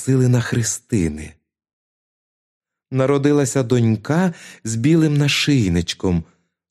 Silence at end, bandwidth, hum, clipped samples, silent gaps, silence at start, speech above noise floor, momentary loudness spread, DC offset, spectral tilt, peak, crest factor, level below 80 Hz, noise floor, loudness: 0.5 s; 14 kHz; none; under 0.1%; 1.73-2.61 s; 0 s; over 73 dB; 9 LU; under 0.1%; -5.5 dB/octave; -4 dBFS; 16 dB; -44 dBFS; under -90 dBFS; -18 LUFS